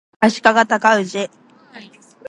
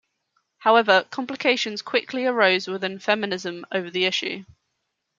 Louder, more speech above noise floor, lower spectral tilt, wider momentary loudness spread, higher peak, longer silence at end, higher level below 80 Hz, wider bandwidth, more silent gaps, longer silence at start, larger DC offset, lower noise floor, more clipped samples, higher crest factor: first, -15 LUFS vs -22 LUFS; second, 27 dB vs 55 dB; about the same, -4 dB/octave vs -3.5 dB/octave; about the same, 12 LU vs 10 LU; first, 0 dBFS vs -4 dBFS; second, 0.45 s vs 0.75 s; first, -64 dBFS vs -74 dBFS; first, 11 kHz vs 7.6 kHz; neither; second, 0.2 s vs 0.6 s; neither; second, -42 dBFS vs -77 dBFS; neither; about the same, 18 dB vs 20 dB